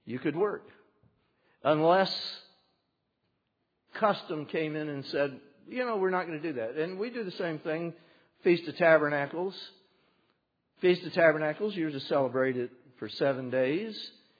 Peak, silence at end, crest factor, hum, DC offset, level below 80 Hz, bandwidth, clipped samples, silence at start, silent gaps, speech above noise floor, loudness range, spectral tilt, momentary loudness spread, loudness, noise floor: -8 dBFS; 0.3 s; 22 dB; none; under 0.1%; -84 dBFS; 5 kHz; under 0.1%; 0.05 s; none; 50 dB; 5 LU; -4 dB/octave; 16 LU; -30 LUFS; -79 dBFS